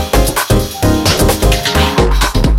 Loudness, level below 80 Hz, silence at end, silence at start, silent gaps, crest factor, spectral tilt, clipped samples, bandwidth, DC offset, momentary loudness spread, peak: -12 LUFS; -16 dBFS; 0 s; 0 s; none; 12 dB; -4.5 dB/octave; under 0.1%; 17 kHz; under 0.1%; 2 LU; 0 dBFS